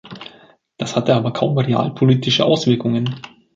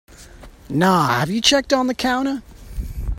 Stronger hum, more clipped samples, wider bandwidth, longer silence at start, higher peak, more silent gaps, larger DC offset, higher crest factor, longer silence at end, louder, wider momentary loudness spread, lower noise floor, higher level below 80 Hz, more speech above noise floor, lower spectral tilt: neither; neither; second, 7.6 kHz vs 16.5 kHz; about the same, 0.05 s vs 0.1 s; about the same, -2 dBFS vs 0 dBFS; neither; neither; about the same, 18 dB vs 20 dB; first, 0.3 s vs 0 s; about the same, -17 LUFS vs -18 LUFS; first, 19 LU vs 16 LU; first, -49 dBFS vs -42 dBFS; second, -56 dBFS vs -34 dBFS; first, 32 dB vs 24 dB; first, -6.5 dB/octave vs -4 dB/octave